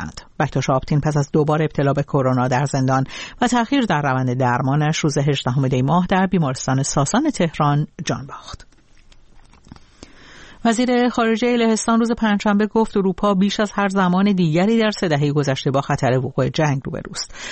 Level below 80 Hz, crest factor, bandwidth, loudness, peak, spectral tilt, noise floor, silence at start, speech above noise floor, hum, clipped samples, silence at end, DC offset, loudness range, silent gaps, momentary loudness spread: -44 dBFS; 14 dB; 8.8 kHz; -19 LUFS; -4 dBFS; -6 dB/octave; -48 dBFS; 0 s; 29 dB; none; under 0.1%; 0 s; under 0.1%; 5 LU; none; 6 LU